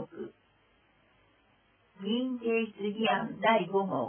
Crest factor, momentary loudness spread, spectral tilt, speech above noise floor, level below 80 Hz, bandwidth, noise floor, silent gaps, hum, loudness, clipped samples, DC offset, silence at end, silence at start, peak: 20 dB; 16 LU; -9 dB/octave; 38 dB; -76 dBFS; 3.5 kHz; -67 dBFS; none; none; -30 LUFS; under 0.1%; under 0.1%; 0 s; 0 s; -12 dBFS